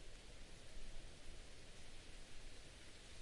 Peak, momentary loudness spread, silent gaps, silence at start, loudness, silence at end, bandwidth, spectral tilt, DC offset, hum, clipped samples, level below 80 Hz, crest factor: -40 dBFS; 1 LU; none; 0 s; -59 LUFS; 0 s; 11.5 kHz; -3 dB/octave; under 0.1%; none; under 0.1%; -58 dBFS; 12 dB